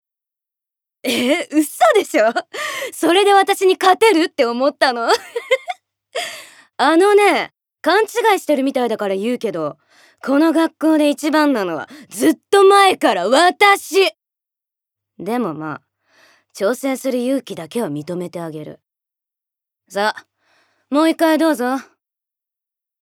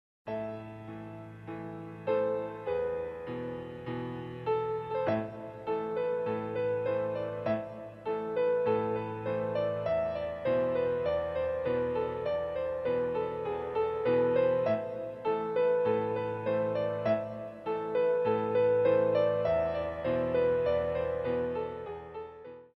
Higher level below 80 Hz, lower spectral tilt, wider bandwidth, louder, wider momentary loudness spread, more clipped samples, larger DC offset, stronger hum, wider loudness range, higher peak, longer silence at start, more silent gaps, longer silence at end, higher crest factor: second, -78 dBFS vs -60 dBFS; second, -3.5 dB/octave vs -8.5 dB/octave; first, 18 kHz vs 5.8 kHz; first, -16 LUFS vs -31 LUFS; first, 16 LU vs 13 LU; neither; neither; neither; first, 9 LU vs 6 LU; first, 0 dBFS vs -16 dBFS; first, 1.05 s vs 0.25 s; neither; first, 1.2 s vs 0.1 s; about the same, 18 dB vs 16 dB